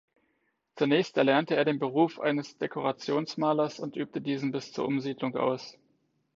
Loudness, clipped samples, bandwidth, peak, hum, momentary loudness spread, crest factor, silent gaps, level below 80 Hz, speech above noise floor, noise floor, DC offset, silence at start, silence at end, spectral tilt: -29 LUFS; under 0.1%; 7.6 kHz; -8 dBFS; none; 9 LU; 20 dB; none; -76 dBFS; 47 dB; -76 dBFS; under 0.1%; 0.75 s; 0.65 s; -6 dB/octave